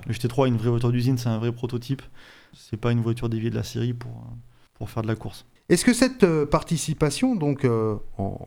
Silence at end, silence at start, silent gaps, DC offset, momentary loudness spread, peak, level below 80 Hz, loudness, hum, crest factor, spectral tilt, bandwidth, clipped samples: 0 s; 0 s; none; under 0.1%; 15 LU; -2 dBFS; -46 dBFS; -24 LUFS; none; 22 dB; -6 dB/octave; 16 kHz; under 0.1%